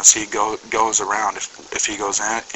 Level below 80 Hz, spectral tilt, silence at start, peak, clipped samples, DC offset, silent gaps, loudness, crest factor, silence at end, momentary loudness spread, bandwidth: -54 dBFS; 0.5 dB/octave; 0 s; 0 dBFS; under 0.1%; under 0.1%; none; -19 LUFS; 20 dB; 0 s; 6 LU; 8.4 kHz